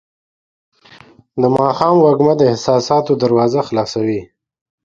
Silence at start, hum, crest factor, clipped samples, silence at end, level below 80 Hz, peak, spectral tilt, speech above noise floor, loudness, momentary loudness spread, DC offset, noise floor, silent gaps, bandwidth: 1.35 s; none; 16 dB; under 0.1%; 0.6 s; -54 dBFS; 0 dBFS; -7 dB/octave; 31 dB; -14 LUFS; 8 LU; under 0.1%; -44 dBFS; none; 7.6 kHz